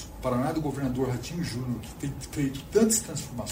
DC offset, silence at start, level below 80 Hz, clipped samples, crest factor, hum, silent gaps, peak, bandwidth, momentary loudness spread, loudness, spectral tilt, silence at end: under 0.1%; 0 s; -46 dBFS; under 0.1%; 18 dB; none; none; -10 dBFS; 16 kHz; 11 LU; -29 LUFS; -5 dB/octave; 0 s